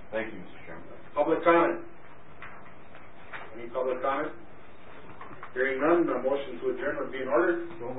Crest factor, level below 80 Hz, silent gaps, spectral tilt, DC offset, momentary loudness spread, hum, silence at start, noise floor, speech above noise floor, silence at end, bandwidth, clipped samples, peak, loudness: 22 dB; -62 dBFS; none; -9.5 dB/octave; 1%; 24 LU; none; 0 s; -52 dBFS; 24 dB; 0 s; 4 kHz; under 0.1%; -8 dBFS; -28 LUFS